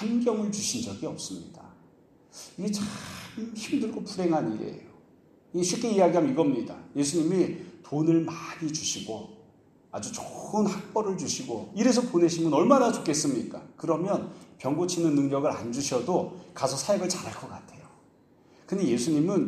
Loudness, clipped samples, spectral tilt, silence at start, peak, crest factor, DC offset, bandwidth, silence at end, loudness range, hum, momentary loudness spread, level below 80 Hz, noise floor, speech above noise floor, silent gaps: -28 LUFS; under 0.1%; -5 dB/octave; 0 s; -6 dBFS; 22 dB; under 0.1%; 14 kHz; 0 s; 7 LU; none; 15 LU; -68 dBFS; -59 dBFS; 32 dB; none